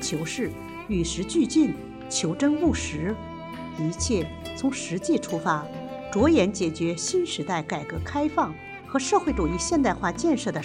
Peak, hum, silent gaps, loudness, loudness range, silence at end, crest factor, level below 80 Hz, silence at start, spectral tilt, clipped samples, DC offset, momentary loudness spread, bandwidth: -8 dBFS; none; none; -26 LUFS; 2 LU; 0 s; 18 dB; -44 dBFS; 0 s; -4.5 dB/octave; under 0.1%; under 0.1%; 9 LU; 14 kHz